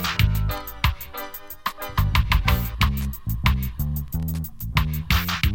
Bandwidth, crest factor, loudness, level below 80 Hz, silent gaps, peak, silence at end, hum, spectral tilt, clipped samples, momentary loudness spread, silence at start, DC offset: 17 kHz; 20 dB; -24 LUFS; -26 dBFS; none; -4 dBFS; 0 s; none; -5 dB/octave; under 0.1%; 10 LU; 0 s; under 0.1%